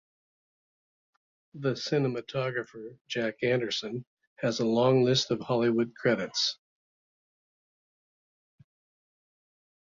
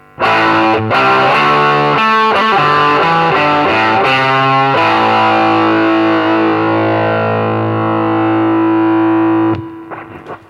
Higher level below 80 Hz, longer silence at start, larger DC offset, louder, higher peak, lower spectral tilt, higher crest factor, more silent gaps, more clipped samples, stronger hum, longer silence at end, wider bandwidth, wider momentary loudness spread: second, -70 dBFS vs -52 dBFS; first, 1.55 s vs 0.2 s; neither; second, -28 LUFS vs -11 LUFS; second, -12 dBFS vs 0 dBFS; second, -5 dB/octave vs -6.5 dB/octave; first, 18 dB vs 12 dB; first, 3.01-3.05 s, 4.07-4.17 s, 4.27-4.36 s vs none; neither; neither; first, 3.35 s vs 0.1 s; second, 7.6 kHz vs 10.5 kHz; first, 12 LU vs 5 LU